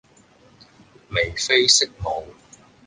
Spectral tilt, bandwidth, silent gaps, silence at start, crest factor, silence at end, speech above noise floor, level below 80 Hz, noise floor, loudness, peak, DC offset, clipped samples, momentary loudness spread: -1.5 dB/octave; 10 kHz; none; 1.1 s; 24 dB; 0.55 s; 33 dB; -46 dBFS; -54 dBFS; -19 LUFS; -2 dBFS; under 0.1%; under 0.1%; 14 LU